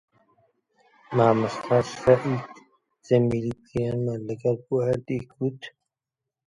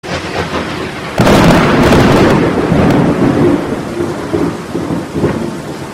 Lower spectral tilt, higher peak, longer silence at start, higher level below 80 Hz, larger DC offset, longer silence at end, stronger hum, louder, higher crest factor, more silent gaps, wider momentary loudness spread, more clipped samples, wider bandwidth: about the same, -7.5 dB/octave vs -6.5 dB/octave; second, -4 dBFS vs 0 dBFS; first, 1.1 s vs 0.05 s; second, -56 dBFS vs -28 dBFS; neither; first, 0.8 s vs 0 s; neither; second, -25 LUFS vs -11 LUFS; first, 22 dB vs 12 dB; neither; about the same, 10 LU vs 11 LU; neither; second, 11 kHz vs 16.5 kHz